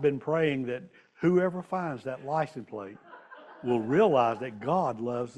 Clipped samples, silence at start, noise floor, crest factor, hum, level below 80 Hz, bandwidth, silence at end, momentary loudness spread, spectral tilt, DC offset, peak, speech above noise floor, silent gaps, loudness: under 0.1%; 0 s; -49 dBFS; 18 dB; none; -68 dBFS; 9.6 kHz; 0 s; 16 LU; -8 dB/octave; under 0.1%; -12 dBFS; 21 dB; none; -29 LUFS